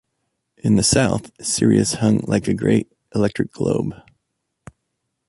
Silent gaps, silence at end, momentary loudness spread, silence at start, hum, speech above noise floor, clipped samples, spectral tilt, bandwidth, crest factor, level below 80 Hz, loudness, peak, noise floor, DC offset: none; 1.35 s; 8 LU; 0.65 s; none; 57 dB; under 0.1%; -5 dB/octave; 11.5 kHz; 18 dB; -46 dBFS; -19 LUFS; -2 dBFS; -75 dBFS; under 0.1%